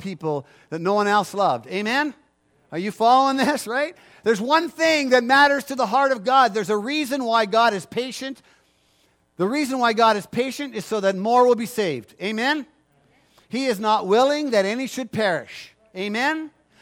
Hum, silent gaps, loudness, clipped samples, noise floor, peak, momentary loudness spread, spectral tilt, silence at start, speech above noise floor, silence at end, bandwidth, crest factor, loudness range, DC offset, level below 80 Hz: none; none; -21 LUFS; under 0.1%; -63 dBFS; -4 dBFS; 12 LU; -4 dB/octave; 0 s; 42 dB; 0.35 s; 17 kHz; 18 dB; 4 LU; under 0.1%; -70 dBFS